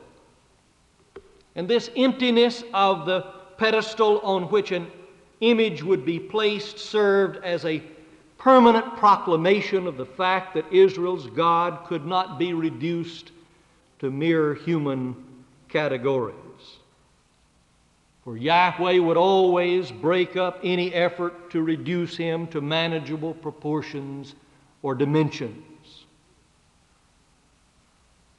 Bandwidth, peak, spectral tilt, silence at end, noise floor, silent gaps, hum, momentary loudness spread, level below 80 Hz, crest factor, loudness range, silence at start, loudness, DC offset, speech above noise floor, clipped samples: 9.2 kHz; -4 dBFS; -6.5 dB/octave; 2.75 s; -62 dBFS; none; none; 13 LU; -66 dBFS; 20 dB; 9 LU; 1.15 s; -23 LUFS; under 0.1%; 39 dB; under 0.1%